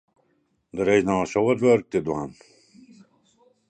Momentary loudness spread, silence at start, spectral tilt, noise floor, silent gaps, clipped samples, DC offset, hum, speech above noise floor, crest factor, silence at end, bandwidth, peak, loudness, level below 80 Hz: 13 LU; 0.75 s; -6.5 dB/octave; -69 dBFS; none; under 0.1%; under 0.1%; none; 47 dB; 18 dB; 1.35 s; 9 kHz; -6 dBFS; -22 LUFS; -56 dBFS